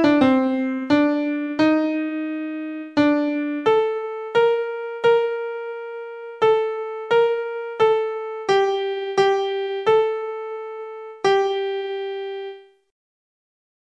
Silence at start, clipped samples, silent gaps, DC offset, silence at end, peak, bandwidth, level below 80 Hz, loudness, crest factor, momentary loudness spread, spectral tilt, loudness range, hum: 0 s; under 0.1%; none; under 0.1%; 1.2 s; -4 dBFS; 8.4 kHz; -64 dBFS; -21 LUFS; 16 dB; 12 LU; -5.5 dB/octave; 3 LU; none